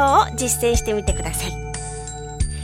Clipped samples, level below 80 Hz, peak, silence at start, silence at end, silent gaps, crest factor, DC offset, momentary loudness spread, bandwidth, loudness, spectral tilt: under 0.1%; -28 dBFS; -4 dBFS; 0 s; 0 s; none; 18 dB; under 0.1%; 13 LU; 17 kHz; -22 LUFS; -4 dB/octave